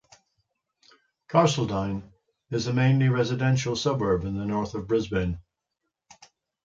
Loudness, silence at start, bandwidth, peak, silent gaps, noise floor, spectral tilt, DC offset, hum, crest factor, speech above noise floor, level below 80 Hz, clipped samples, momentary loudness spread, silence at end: -25 LUFS; 1.3 s; 7.8 kHz; -8 dBFS; none; -82 dBFS; -6 dB/octave; under 0.1%; none; 20 dB; 58 dB; -48 dBFS; under 0.1%; 10 LU; 1.25 s